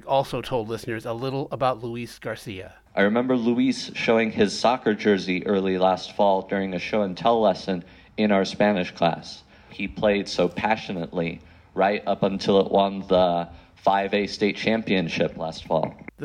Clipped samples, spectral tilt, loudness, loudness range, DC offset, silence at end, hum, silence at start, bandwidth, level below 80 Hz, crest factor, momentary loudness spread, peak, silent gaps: under 0.1%; -6 dB/octave; -24 LUFS; 3 LU; under 0.1%; 0 s; none; 0.05 s; 13 kHz; -54 dBFS; 16 dB; 12 LU; -8 dBFS; none